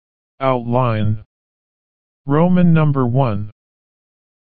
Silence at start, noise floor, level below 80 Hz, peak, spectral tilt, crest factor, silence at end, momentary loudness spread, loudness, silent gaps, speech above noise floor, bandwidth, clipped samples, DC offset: 0.35 s; under -90 dBFS; -46 dBFS; -2 dBFS; -8.5 dB/octave; 16 dB; 0.9 s; 14 LU; -17 LUFS; 1.26-2.24 s; over 75 dB; 4.5 kHz; under 0.1%; 5%